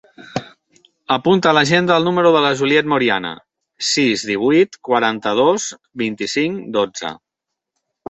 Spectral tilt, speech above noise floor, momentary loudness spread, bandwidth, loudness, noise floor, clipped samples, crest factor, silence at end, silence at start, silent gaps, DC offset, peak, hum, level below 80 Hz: -4 dB/octave; 65 dB; 15 LU; 8.2 kHz; -16 LUFS; -81 dBFS; under 0.1%; 16 dB; 0.95 s; 0.2 s; none; under 0.1%; 0 dBFS; none; -58 dBFS